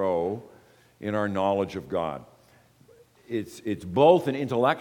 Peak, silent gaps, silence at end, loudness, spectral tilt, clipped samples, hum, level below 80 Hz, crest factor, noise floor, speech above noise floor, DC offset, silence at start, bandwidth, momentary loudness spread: -6 dBFS; none; 0 s; -26 LUFS; -7 dB/octave; under 0.1%; none; -64 dBFS; 22 dB; -58 dBFS; 33 dB; under 0.1%; 0 s; 18 kHz; 14 LU